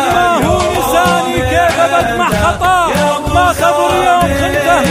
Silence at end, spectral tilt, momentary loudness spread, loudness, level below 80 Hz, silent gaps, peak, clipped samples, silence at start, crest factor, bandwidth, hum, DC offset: 0 s; -4.5 dB/octave; 2 LU; -11 LUFS; -28 dBFS; none; 0 dBFS; under 0.1%; 0 s; 12 dB; 16 kHz; none; under 0.1%